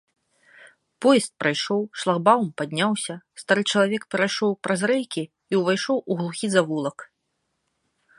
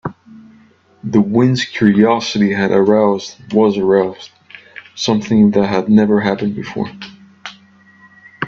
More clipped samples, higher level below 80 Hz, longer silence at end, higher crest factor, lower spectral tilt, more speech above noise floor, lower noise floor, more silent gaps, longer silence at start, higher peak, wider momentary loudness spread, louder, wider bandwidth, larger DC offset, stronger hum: neither; second, -74 dBFS vs -54 dBFS; first, 1.15 s vs 0 s; first, 20 dB vs 14 dB; second, -4.5 dB/octave vs -6.5 dB/octave; first, 53 dB vs 35 dB; first, -76 dBFS vs -49 dBFS; neither; first, 1 s vs 0.05 s; second, -4 dBFS vs 0 dBFS; second, 9 LU vs 22 LU; second, -23 LUFS vs -14 LUFS; first, 11.5 kHz vs 7.6 kHz; neither; neither